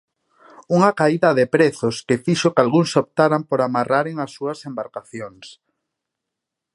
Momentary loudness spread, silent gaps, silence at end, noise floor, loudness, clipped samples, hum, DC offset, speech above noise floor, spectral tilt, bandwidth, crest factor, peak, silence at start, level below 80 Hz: 14 LU; none; 1.25 s; -83 dBFS; -19 LUFS; under 0.1%; none; under 0.1%; 64 dB; -6 dB/octave; 11.5 kHz; 20 dB; 0 dBFS; 0.7 s; -64 dBFS